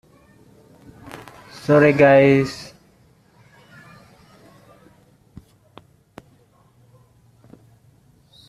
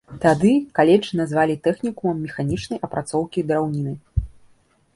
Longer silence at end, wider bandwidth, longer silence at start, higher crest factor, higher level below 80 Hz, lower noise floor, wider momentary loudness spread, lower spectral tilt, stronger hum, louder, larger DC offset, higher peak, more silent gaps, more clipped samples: first, 5.85 s vs 0.65 s; first, 13 kHz vs 11.5 kHz; first, 1.15 s vs 0.1 s; about the same, 20 dB vs 18 dB; second, -58 dBFS vs -40 dBFS; about the same, -56 dBFS vs -57 dBFS; first, 28 LU vs 11 LU; about the same, -7.5 dB/octave vs -7 dB/octave; neither; first, -15 LUFS vs -21 LUFS; neither; about the same, -2 dBFS vs -2 dBFS; neither; neither